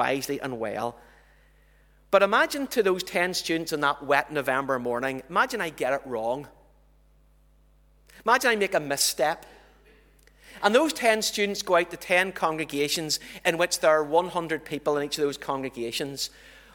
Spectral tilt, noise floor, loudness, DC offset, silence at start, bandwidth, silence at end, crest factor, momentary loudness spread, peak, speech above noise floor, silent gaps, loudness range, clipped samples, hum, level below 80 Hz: -3 dB/octave; -59 dBFS; -25 LUFS; under 0.1%; 0 s; 20 kHz; 0.25 s; 22 dB; 9 LU; -6 dBFS; 33 dB; none; 4 LU; under 0.1%; none; -60 dBFS